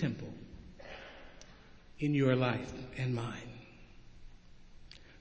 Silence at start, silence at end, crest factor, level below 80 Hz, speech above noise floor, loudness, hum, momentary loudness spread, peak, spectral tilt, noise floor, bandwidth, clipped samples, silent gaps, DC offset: 0 s; 0 s; 22 dB; -58 dBFS; 23 dB; -35 LUFS; none; 26 LU; -16 dBFS; -7.5 dB/octave; -55 dBFS; 8 kHz; under 0.1%; none; under 0.1%